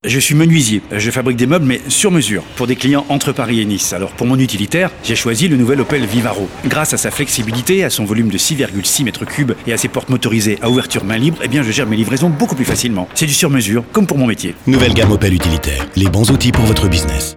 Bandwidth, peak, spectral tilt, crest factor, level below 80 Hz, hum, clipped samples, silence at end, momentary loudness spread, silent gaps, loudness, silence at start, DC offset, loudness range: 17.5 kHz; -2 dBFS; -4.5 dB/octave; 12 dB; -32 dBFS; none; under 0.1%; 0 s; 5 LU; none; -14 LUFS; 0.05 s; under 0.1%; 2 LU